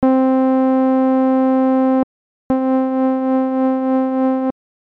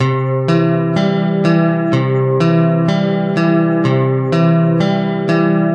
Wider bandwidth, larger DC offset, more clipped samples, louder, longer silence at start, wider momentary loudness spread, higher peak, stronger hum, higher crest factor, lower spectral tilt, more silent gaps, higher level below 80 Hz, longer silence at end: second, 3.9 kHz vs 7 kHz; neither; neither; about the same, -16 LUFS vs -14 LUFS; about the same, 0 s vs 0 s; about the same, 5 LU vs 3 LU; second, -6 dBFS vs -2 dBFS; neither; about the same, 10 dB vs 10 dB; about the same, -9 dB/octave vs -8.5 dB/octave; first, 2.03-2.50 s vs none; about the same, -54 dBFS vs -58 dBFS; first, 0.45 s vs 0 s